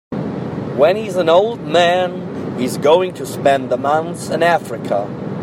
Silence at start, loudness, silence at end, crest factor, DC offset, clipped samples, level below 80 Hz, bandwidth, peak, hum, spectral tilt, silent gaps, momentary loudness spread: 0.1 s; -17 LUFS; 0 s; 16 dB; under 0.1%; under 0.1%; -56 dBFS; 16 kHz; -2 dBFS; none; -5.5 dB/octave; none; 10 LU